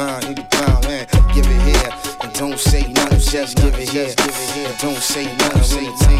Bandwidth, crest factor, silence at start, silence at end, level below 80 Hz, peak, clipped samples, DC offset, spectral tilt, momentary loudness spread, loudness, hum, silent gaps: 16 kHz; 14 dB; 0 s; 0 s; -18 dBFS; 0 dBFS; under 0.1%; under 0.1%; -4 dB/octave; 7 LU; -17 LUFS; none; none